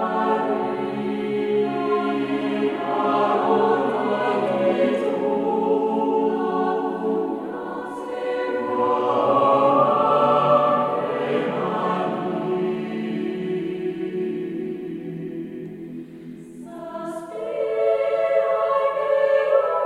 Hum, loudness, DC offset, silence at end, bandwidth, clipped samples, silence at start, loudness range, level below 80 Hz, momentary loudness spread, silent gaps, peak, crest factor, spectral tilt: none; -22 LUFS; under 0.1%; 0 s; 11 kHz; under 0.1%; 0 s; 10 LU; -66 dBFS; 14 LU; none; -6 dBFS; 16 dB; -7.5 dB/octave